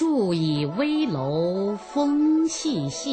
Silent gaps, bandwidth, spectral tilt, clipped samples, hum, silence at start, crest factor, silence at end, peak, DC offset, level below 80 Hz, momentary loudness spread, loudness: none; 9.2 kHz; -5.5 dB/octave; under 0.1%; none; 0 s; 10 dB; 0 s; -12 dBFS; under 0.1%; -60 dBFS; 6 LU; -24 LUFS